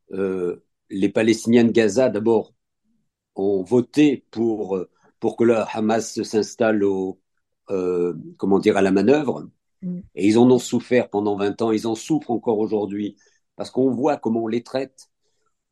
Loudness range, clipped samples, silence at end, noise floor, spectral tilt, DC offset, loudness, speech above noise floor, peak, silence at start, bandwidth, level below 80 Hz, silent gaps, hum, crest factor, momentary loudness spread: 4 LU; under 0.1%; 0.85 s; -72 dBFS; -6 dB/octave; under 0.1%; -21 LUFS; 52 dB; -4 dBFS; 0.1 s; 12.5 kHz; -66 dBFS; none; none; 18 dB; 13 LU